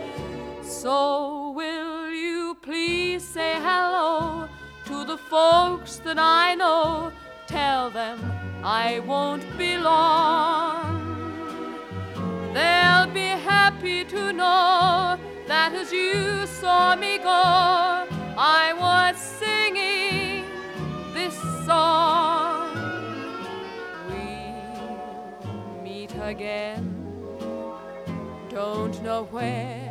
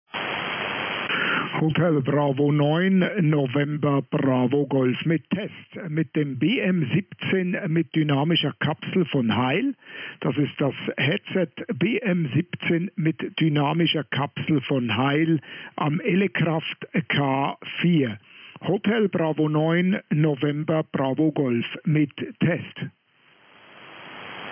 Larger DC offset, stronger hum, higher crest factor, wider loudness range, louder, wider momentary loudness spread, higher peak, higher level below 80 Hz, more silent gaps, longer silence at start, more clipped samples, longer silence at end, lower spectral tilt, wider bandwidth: neither; neither; first, 20 dB vs 12 dB; first, 13 LU vs 3 LU; about the same, -23 LUFS vs -23 LUFS; first, 17 LU vs 7 LU; first, -4 dBFS vs -12 dBFS; first, -52 dBFS vs -72 dBFS; neither; second, 0 s vs 0.15 s; neither; about the same, 0 s vs 0 s; second, -4 dB/octave vs -10.5 dB/octave; first, 16 kHz vs 5.2 kHz